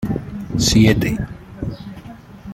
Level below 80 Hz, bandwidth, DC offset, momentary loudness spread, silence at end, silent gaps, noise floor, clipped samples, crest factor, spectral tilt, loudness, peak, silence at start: -34 dBFS; 16.5 kHz; under 0.1%; 24 LU; 0 s; none; -37 dBFS; under 0.1%; 18 dB; -5 dB/octave; -18 LUFS; -2 dBFS; 0 s